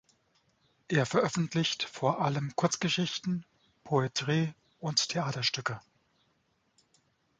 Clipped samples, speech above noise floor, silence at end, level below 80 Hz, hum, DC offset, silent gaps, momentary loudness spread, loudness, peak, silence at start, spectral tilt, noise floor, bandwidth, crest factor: under 0.1%; 43 dB; 1.6 s; -70 dBFS; none; under 0.1%; none; 7 LU; -31 LUFS; -12 dBFS; 0.9 s; -4.5 dB/octave; -74 dBFS; 9.4 kHz; 22 dB